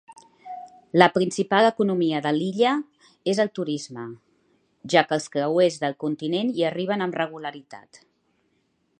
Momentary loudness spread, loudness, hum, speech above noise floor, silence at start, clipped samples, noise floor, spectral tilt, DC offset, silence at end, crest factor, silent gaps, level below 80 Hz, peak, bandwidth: 19 LU; -23 LUFS; none; 47 dB; 0.1 s; under 0.1%; -69 dBFS; -5 dB/octave; under 0.1%; 1.2 s; 24 dB; none; -74 dBFS; 0 dBFS; 10 kHz